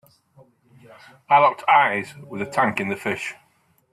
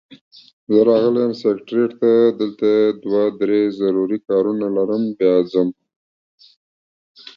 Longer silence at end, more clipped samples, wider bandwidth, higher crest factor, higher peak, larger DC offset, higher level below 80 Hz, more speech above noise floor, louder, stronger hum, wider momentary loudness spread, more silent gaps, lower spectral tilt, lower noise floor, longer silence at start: first, 0.6 s vs 0.05 s; neither; first, 14 kHz vs 6.4 kHz; about the same, 20 dB vs 16 dB; about the same, -4 dBFS vs -2 dBFS; neither; about the same, -68 dBFS vs -64 dBFS; second, 35 dB vs over 73 dB; about the same, -20 LUFS vs -18 LUFS; neither; first, 15 LU vs 6 LU; second, none vs 5.96-6.38 s, 6.56-7.15 s; second, -5 dB/octave vs -8.5 dB/octave; second, -55 dBFS vs under -90 dBFS; first, 1.3 s vs 0.7 s